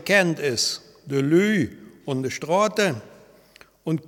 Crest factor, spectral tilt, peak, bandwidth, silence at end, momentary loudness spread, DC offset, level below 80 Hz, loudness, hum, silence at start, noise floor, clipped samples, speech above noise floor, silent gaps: 20 dB; -4.5 dB/octave; -4 dBFS; 18 kHz; 0.1 s; 14 LU; under 0.1%; -64 dBFS; -22 LUFS; none; 0 s; -53 dBFS; under 0.1%; 31 dB; none